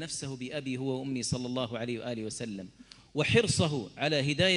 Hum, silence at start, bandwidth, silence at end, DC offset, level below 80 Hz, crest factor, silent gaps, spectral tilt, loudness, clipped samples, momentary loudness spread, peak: none; 0 s; 11.5 kHz; 0 s; under 0.1%; -58 dBFS; 20 dB; none; -4.5 dB/octave; -31 LUFS; under 0.1%; 12 LU; -12 dBFS